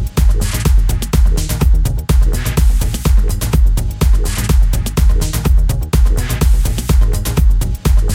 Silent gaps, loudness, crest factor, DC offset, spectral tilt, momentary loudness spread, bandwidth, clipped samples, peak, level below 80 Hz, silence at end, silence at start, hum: none; -15 LUFS; 10 dB; under 0.1%; -5.5 dB/octave; 2 LU; 16.5 kHz; under 0.1%; 0 dBFS; -12 dBFS; 0 s; 0 s; none